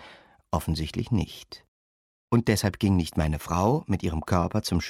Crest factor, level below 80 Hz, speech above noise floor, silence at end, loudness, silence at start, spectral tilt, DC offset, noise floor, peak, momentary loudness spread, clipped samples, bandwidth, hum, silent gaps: 20 dB; -40 dBFS; 26 dB; 0 s; -27 LUFS; 0 s; -6 dB/octave; under 0.1%; -52 dBFS; -8 dBFS; 9 LU; under 0.1%; 16 kHz; none; 1.68-2.28 s